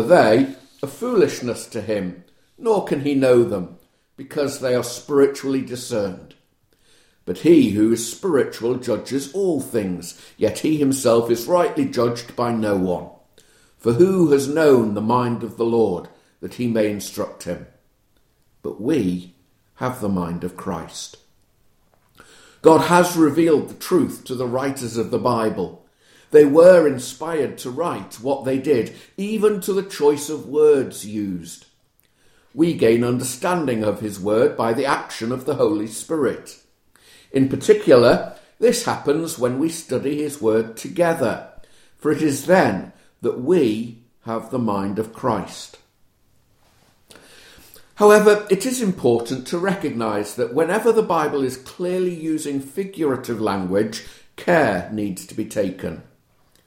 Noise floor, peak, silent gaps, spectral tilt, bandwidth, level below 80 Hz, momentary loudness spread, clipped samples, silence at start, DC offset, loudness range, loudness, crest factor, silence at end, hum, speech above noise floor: -61 dBFS; 0 dBFS; none; -5.5 dB/octave; 16.5 kHz; -56 dBFS; 14 LU; under 0.1%; 0 s; under 0.1%; 8 LU; -20 LUFS; 20 dB; 0.65 s; none; 42 dB